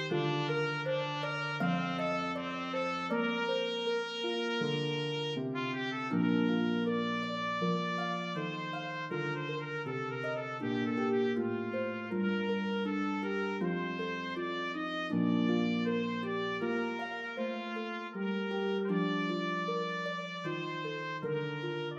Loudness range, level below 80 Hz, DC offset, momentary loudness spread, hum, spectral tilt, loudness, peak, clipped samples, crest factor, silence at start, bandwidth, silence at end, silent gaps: 2 LU; -80 dBFS; under 0.1%; 6 LU; none; -6.5 dB/octave; -34 LUFS; -18 dBFS; under 0.1%; 14 dB; 0 s; 8.4 kHz; 0 s; none